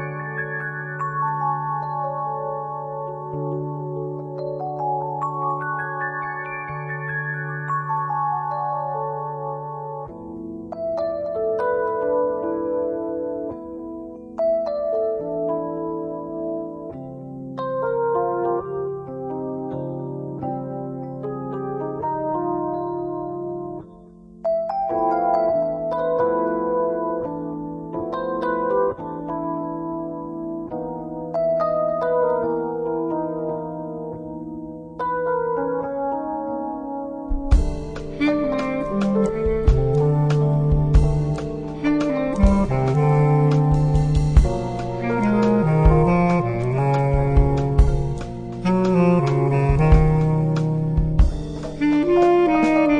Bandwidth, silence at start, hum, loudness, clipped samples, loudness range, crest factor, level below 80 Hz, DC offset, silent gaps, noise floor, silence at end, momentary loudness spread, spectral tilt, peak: 9.6 kHz; 0 s; none; -22 LUFS; under 0.1%; 8 LU; 20 dB; -28 dBFS; under 0.1%; none; -44 dBFS; 0 s; 12 LU; -9 dB/octave; -2 dBFS